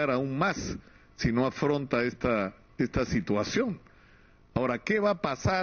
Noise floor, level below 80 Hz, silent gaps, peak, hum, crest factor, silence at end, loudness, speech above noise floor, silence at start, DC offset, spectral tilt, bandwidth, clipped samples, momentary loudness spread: -57 dBFS; -48 dBFS; none; -12 dBFS; none; 18 dB; 0 s; -29 LUFS; 29 dB; 0 s; under 0.1%; -5 dB/octave; 7 kHz; under 0.1%; 8 LU